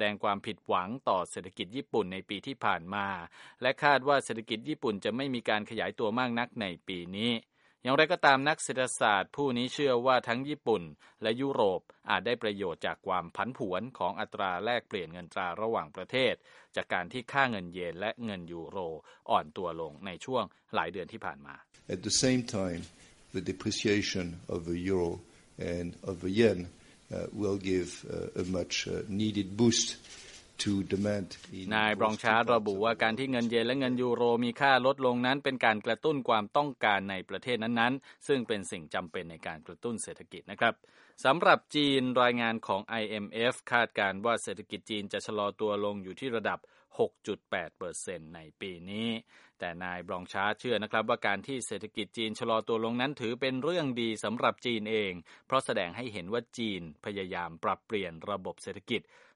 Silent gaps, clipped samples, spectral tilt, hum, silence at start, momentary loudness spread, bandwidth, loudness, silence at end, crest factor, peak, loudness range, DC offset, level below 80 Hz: none; under 0.1%; -4 dB/octave; none; 0 s; 13 LU; 11.5 kHz; -31 LUFS; 0.35 s; 24 dB; -8 dBFS; 7 LU; under 0.1%; -66 dBFS